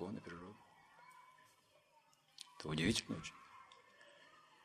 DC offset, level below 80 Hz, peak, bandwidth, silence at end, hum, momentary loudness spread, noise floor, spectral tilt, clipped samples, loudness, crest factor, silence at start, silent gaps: under 0.1%; -68 dBFS; -18 dBFS; 14 kHz; 0.25 s; none; 26 LU; -72 dBFS; -4 dB/octave; under 0.1%; -42 LUFS; 30 dB; 0 s; none